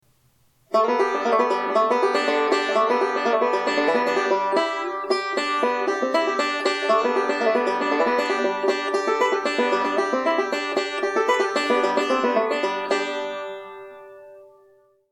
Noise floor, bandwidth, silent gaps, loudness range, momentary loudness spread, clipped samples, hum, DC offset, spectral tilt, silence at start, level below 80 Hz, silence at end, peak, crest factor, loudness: -61 dBFS; 12 kHz; none; 2 LU; 4 LU; under 0.1%; none; under 0.1%; -3 dB/octave; 0.7 s; -76 dBFS; 0.65 s; -8 dBFS; 14 dB; -22 LUFS